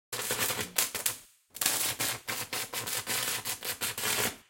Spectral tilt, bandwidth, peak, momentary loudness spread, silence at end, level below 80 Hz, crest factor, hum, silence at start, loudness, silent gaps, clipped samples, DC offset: -0.5 dB/octave; 17 kHz; 0 dBFS; 5 LU; 0.1 s; -66 dBFS; 32 dB; none; 0.1 s; -30 LUFS; none; under 0.1%; under 0.1%